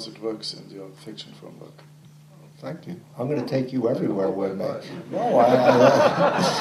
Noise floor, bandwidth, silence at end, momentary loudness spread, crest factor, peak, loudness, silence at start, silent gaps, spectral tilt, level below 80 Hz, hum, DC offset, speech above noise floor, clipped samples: -48 dBFS; 14 kHz; 0 s; 23 LU; 20 dB; -2 dBFS; -21 LUFS; 0 s; none; -5.5 dB/octave; -70 dBFS; none; under 0.1%; 26 dB; under 0.1%